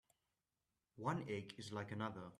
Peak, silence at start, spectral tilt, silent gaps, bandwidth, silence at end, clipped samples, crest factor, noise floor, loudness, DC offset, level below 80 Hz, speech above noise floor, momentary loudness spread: -28 dBFS; 0.95 s; -6 dB/octave; none; 14 kHz; 0.05 s; under 0.1%; 20 dB; under -90 dBFS; -46 LUFS; under 0.1%; -80 dBFS; over 44 dB; 5 LU